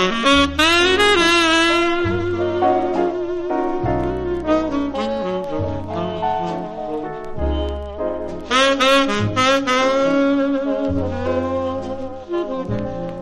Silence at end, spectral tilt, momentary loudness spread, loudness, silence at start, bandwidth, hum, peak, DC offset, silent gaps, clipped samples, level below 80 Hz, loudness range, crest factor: 0 s; -4.5 dB/octave; 12 LU; -18 LUFS; 0 s; 13 kHz; none; -2 dBFS; under 0.1%; none; under 0.1%; -36 dBFS; 7 LU; 16 dB